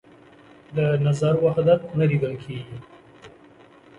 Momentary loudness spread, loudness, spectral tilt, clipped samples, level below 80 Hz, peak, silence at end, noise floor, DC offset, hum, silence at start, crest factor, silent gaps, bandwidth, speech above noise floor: 15 LU; -22 LUFS; -8 dB/octave; under 0.1%; -58 dBFS; -6 dBFS; 0.7 s; -50 dBFS; under 0.1%; none; 0.7 s; 18 dB; none; 10.5 kHz; 29 dB